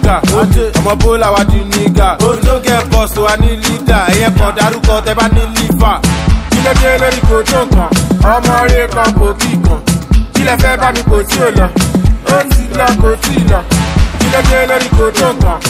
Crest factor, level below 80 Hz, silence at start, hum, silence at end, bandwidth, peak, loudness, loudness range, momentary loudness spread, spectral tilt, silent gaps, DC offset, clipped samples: 8 dB; -14 dBFS; 0 s; none; 0 s; 16 kHz; 0 dBFS; -10 LUFS; 1 LU; 3 LU; -5 dB/octave; none; under 0.1%; 0.6%